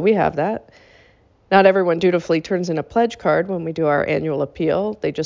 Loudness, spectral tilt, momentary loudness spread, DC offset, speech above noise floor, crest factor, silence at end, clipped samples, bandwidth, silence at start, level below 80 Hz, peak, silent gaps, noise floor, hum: -19 LUFS; -7 dB/octave; 9 LU; under 0.1%; 36 dB; 18 dB; 0 s; under 0.1%; 7.6 kHz; 0 s; -52 dBFS; -2 dBFS; none; -54 dBFS; none